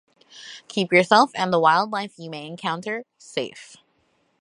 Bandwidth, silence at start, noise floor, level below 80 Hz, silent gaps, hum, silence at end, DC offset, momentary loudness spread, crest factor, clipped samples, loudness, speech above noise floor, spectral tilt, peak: 11.5 kHz; 0.35 s; -67 dBFS; -72 dBFS; none; none; 0.75 s; under 0.1%; 18 LU; 22 dB; under 0.1%; -21 LUFS; 44 dB; -4.5 dB/octave; -2 dBFS